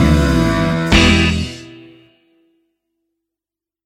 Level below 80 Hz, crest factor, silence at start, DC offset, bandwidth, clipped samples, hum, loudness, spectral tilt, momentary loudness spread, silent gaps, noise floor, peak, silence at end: -24 dBFS; 16 dB; 0 s; under 0.1%; 15 kHz; under 0.1%; none; -13 LUFS; -5.5 dB/octave; 14 LU; none; -88 dBFS; 0 dBFS; 2.1 s